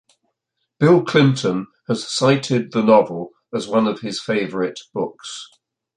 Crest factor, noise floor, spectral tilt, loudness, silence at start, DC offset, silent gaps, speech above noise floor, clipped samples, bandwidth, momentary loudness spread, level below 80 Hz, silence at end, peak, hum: 18 dB; -76 dBFS; -6 dB/octave; -19 LUFS; 0.8 s; under 0.1%; none; 58 dB; under 0.1%; 10.5 kHz; 13 LU; -62 dBFS; 0.5 s; -2 dBFS; none